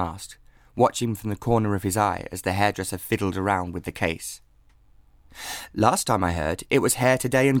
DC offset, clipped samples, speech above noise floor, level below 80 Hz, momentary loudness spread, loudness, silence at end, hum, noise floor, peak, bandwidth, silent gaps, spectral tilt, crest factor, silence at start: under 0.1%; under 0.1%; 32 dB; -48 dBFS; 14 LU; -24 LUFS; 0 s; none; -56 dBFS; -4 dBFS; 19.5 kHz; none; -5 dB/octave; 20 dB; 0 s